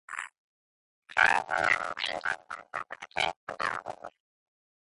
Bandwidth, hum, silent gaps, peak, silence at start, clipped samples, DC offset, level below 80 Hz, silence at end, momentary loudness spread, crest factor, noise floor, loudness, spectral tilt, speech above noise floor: 11.5 kHz; none; 0.38-1.02 s, 3.36-3.47 s; -8 dBFS; 0.1 s; under 0.1%; under 0.1%; -66 dBFS; 0.7 s; 17 LU; 24 dB; under -90 dBFS; -30 LUFS; -1.5 dB/octave; over 59 dB